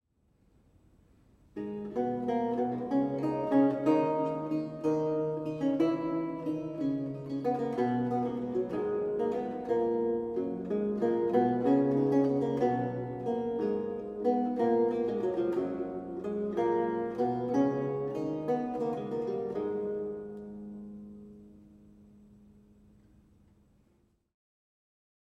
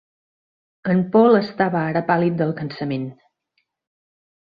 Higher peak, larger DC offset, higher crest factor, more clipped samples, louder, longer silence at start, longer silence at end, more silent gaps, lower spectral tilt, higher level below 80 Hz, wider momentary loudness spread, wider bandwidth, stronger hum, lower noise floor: second, -14 dBFS vs -4 dBFS; neither; about the same, 18 dB vs 18 dB; neither; second, -31 LUFS vs -20 LUFS; first, 1.55 s vs 0.85 s; first, 3.55 s vs 1.4 s; neither; about the same, -9 dB/octave vs -10 dB/octave; about the same, -66 dBFS vs -62 dBFS; second, 10 LU vs 13 LU; first, 8 kHz vs 5 kHz; neither; about the same, -70 dBFS vs -72 dBFS